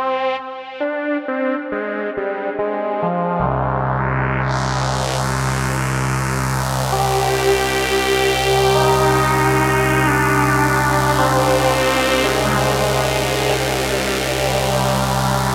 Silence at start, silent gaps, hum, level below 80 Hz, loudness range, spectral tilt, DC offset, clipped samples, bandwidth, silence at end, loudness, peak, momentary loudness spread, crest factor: 0 s; none; none; -34 dBFS; 5 LU; -4.5 dB/octave; under 0.1%; under 0.1%; 17 kHz; 0 s; -17 LUFS; -2 dBFS; 7 LU; 16 dB